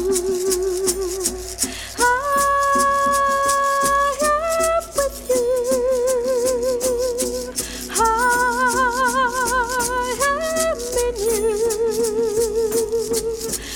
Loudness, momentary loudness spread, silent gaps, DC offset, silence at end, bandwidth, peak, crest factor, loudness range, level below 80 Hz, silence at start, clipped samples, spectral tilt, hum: -19 LUFS; 6 LU; none; under 0.1%; 0 s; 20 kHz; -2 dBFS; 18 dB; 2 LU; -40 dBFS; 0 s; under 0.1%; -2 dB/octave; none